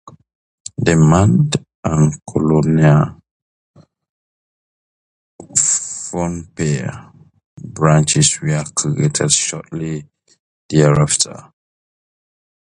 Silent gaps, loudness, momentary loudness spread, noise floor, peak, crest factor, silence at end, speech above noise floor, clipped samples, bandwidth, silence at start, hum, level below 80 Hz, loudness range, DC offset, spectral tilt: 0.35-0.65 s, 1.75-1.83 s, 3.31-3.74 s, 4.09-5.39 s, 7.46-7.57 s, 10.39-10.69 s; -15 LUFS; 13 LU; under -90 dBFS; 0 dBFS; 18 dB; 1.35 s; over 75 dB; under 0.1%; 11 kHz; 0.05 s; none; -40 dBFS; 6 LU; under 0.1%; -5 dB/octave